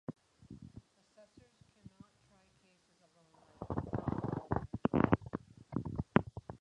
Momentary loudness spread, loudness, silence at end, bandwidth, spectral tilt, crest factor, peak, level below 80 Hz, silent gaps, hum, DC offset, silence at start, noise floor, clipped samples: 24 LU; -37 LUFS; 0.05 s; 10 kHz; -9 dB/octave; 30 dB; -10 dBFS; -56 dBFS; none; none; under 0.1%; 0.1 s; -71 dBFS; under 0.1%